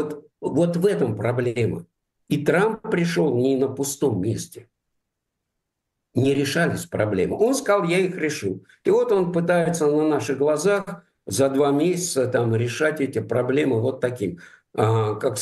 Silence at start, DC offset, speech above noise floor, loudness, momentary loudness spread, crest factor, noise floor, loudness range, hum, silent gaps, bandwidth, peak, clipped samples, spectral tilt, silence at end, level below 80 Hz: 0 s; under 0.1%; 59 dB; -22 LUFS; 9 LU; 18 dB; -80 dBFS; 4 LU; none; none; 12.5 kHz; -4 dBFS; under 0.1%; -5.5 dB/octave; 0 s; -60 dBFS